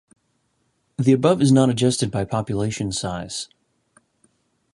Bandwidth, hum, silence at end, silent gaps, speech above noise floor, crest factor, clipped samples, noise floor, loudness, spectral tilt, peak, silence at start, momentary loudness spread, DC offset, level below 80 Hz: 11.5 kHz; none; 1.3 s; none; 49 dB; 20 dB; under 0.1%; -69 dBFS; -20 LUFS; -6 dB/octave; -2 dBFS; 1 s; 14 LU; under 0.1%; -50 dBFS